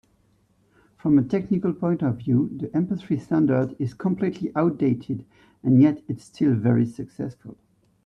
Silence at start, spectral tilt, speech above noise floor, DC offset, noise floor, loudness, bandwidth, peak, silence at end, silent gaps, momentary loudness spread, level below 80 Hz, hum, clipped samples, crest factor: 1.05 s; -10 dB/octave; 41 dB; under 0.1%; -63 dBFS; -23 LUFS; 9.2 kHz; -8 dBFS; 0.5 s; none; 12 LU; -60 dBFS; none; under 0.1%; 16 dB